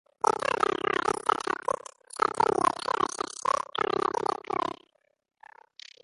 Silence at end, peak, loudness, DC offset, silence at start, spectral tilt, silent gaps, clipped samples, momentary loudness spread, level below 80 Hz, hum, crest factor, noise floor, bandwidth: 1.3 s; -8 dBFS; -28 LUFS; under 0.1%; 0.25 s; -3 dB/octave; none; under 0.1%; 10 LU; -66 dBFS; none; 22 dB; -66 dBFS; 11.5 kHz